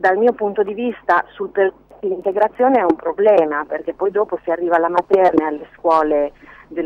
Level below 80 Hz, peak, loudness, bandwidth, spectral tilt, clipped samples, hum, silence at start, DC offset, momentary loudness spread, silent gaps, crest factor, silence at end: -54 dBFS; -2 dBFS; -17 LUFS; 6.4 kHz; -7 dB/octave; under 0.1%; none; 0 s; under 0.1%; 10 LU; none; 14 dB; 0 s